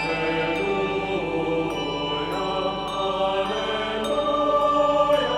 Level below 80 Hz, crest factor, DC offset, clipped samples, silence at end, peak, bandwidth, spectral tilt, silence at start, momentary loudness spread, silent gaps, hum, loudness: -46 dBFS; 14 dB; under 0.1%; under 0.1%; 0 s; -8 dBFS; 14 kHz; -5 dB/octave; 0 s; 6 LU; none; 50 Hz at -50 dBFS; -24 LUFS